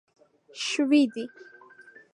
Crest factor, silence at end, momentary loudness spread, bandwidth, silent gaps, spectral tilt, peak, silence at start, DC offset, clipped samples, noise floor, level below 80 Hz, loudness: 18 dB; 0.7 s; 18 LU; 10.5 kHz; none; -2.5 dB/octave; -10 dBFS; 0.55 s; under 0.1%; under 0.1%; -52 dBFS; -86 dBFS; -25 LUFS